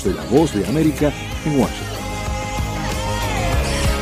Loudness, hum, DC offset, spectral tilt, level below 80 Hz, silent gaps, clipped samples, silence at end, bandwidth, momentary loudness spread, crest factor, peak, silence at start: -20 LUFS; none; under 0.1%; -5.5 dB/octave; -28 dBFS; none; under 0.1%; 0 s; 16 kHz; 8 LU; 18 dB; -2 dBFS; 0 s